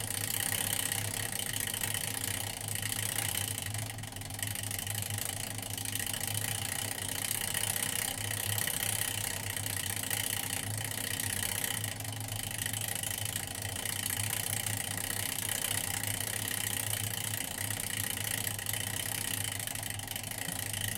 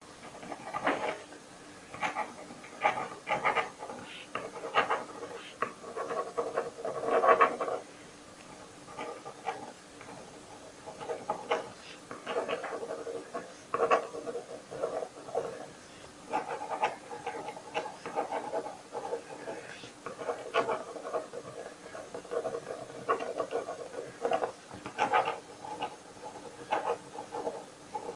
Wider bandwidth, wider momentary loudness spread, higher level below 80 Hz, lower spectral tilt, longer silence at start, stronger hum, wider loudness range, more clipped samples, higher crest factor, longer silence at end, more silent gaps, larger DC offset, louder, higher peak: first, 17 kHz vs 11.5 kHz; second, 5 LU vs 17 LU; first, -58 dBFS vs -74 dBFS; second, -1.5 dB/octave vs -3.5 dB/octave; about the same, 0 s vs 0 s; neither; second, 2 LU vs 8 LU; neither; second, 22 dB vs 28 dB; about the same, 0 s vs 0 s; neither; neither; about the same, -33 LUFS vs -35 LUFS; second, -14 dBFS vs -8 dBFS